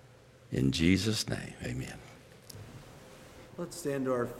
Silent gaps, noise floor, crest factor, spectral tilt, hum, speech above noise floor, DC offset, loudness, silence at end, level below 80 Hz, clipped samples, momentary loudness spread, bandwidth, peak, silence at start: none; -57 dBFS; 22 dB; -5 dB/octave; none; 25 dB; under 0.1%; -32 LUFS; 0 s; -54 dBFS; under 0.1%; 25 LU; 16.5 kHz; -12 dBFS; 0.45 s